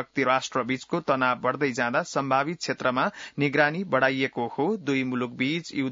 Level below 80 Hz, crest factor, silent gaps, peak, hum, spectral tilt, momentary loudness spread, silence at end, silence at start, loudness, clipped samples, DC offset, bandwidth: -70 dBFS; 20 dB; none; -6 dBFS; none; -5 dB/octave; 5 LU; 0 s; 0 s; -26 LUFS; under 0.1%; under 0.1%; 7.8 kHz